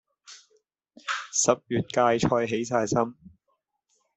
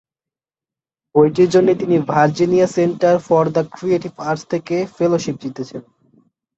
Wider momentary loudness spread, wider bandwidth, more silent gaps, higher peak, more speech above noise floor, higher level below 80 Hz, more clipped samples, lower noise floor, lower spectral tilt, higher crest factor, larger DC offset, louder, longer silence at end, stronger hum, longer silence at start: about the same, 10 LU vs 12 LU; about the same, 8.4 kHz vs 8 kHz; neither; second, -6 dBFS vs -2 dBFS; second, 51 dB vs 74 dB; about the same, -62 dBFS vs -58 dBFS; neither; second, -76 dBFS vs -90 dBFS; second, -4 dB/octave vs -7 dB/octave; first, 22 dB vs 16 dB; neither; second, -25 LUFS vs -17 LUFS; first, 0.9 s vs 0.75 s; neither; second, 0.3 s vs 1.15 s